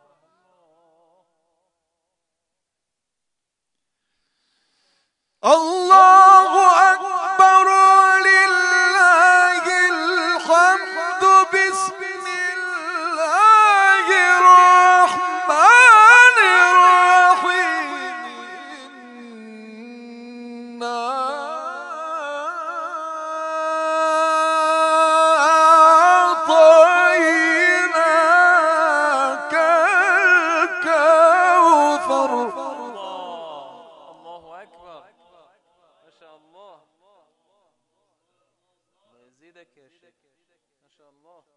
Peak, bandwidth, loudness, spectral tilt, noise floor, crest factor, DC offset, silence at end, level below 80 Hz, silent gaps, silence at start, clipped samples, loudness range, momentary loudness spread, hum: 0 dBFS; 11 kHz; -13 LUFS; -0.5 dB/octave; -82 dBFS; 16 dB; under 0.1%; 7 s; -82 dBFS; none; 5.45 s; under 0.1%; 17 LU; 18 LU; none